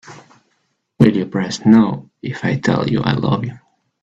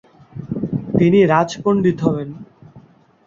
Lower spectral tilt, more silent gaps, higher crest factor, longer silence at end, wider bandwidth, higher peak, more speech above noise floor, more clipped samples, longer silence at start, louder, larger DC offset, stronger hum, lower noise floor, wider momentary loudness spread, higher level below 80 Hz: about the same, -7 dB/octave vs -7.5 dB/octave; neither; about the same, 18 dB vs 16 dB; about the same, 0.45 s vs 0.5 s; about the same, 7.8 kHz vs 7.6 kHz; about the same, 0 dBFS vs -2 dBFS; first, 51 dB vs 31 dB; neither; second, 0.05 s vs 0.35 s; about the same, -16 LUFS vs -17 LUFS; neither; neither; first, -67 dBFS vs -47 dBFS; second, 12 LU vs 21 LU; about the same, -50 dBFS vs -52 dBFS